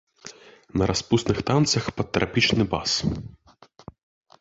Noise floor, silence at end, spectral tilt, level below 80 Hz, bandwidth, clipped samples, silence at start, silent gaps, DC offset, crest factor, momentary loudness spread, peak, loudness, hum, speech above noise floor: -47 dBFS; 1.15 s; -4.5 dB/octave; -44 dBFS; 8 kHz; under 0.1%; 0.25 s; none; under 0.1%; 20 dB; 21 LU; -6 dBFS; -23 LUFS; none; 24 dB